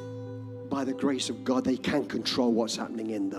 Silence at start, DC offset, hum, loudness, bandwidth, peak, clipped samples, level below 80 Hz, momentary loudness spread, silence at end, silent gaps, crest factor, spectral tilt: 0 s; under 0.1%; none; -29 LUFS; 13.5 kHz; -12 dBFS; under 0.1%; -64 dBFS; 13 LU; 0 s; none; 16 dB; -4.5 dB/octave